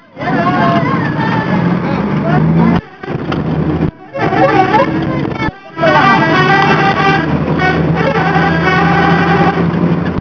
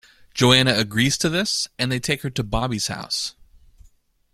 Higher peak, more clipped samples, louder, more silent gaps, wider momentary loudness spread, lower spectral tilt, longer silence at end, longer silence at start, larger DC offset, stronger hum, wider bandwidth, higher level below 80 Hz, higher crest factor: about the same, 0 dBFS vs 0 dBFS; first, 0.2% vs under 0.1%; first, -12 LUFS vs -21 LUFS; neither; about the same, 8 LU vs 10 LU; first, -7.5 dB/octave vs -3.5 dB/octave; second, 0 s vs 1 s; second, 0.15 s vs 0.35 s; first, 0.1% vs under 0.1%; neither; second, 5.4 kHz vs 15.5 kHz; first, -34 dBFS vs -42 dBFS; second, 12 dB vs 22 dB